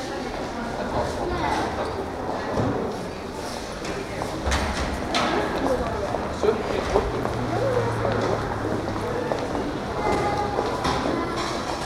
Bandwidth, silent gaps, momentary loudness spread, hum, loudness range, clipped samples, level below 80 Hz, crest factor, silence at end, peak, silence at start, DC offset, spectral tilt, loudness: 16 kHz; none; 6 LU; none; 3 LU; under 0.1%; -38 dBFS; 22 dB; 0 s; -2 dBFS; 0 s; under 0.1%; -5.5 dB/octave; -26 LUFS